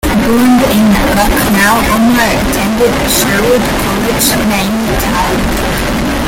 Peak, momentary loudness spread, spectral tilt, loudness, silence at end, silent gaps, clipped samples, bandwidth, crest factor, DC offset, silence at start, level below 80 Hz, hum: 0 dBFS; 5 LU; -4 dB/octave; -10 LUFS; 0 s; none; under 0.1%; 17 kHz; 10 dB; under 0.1%; 0.05 s; -22 dBFS; none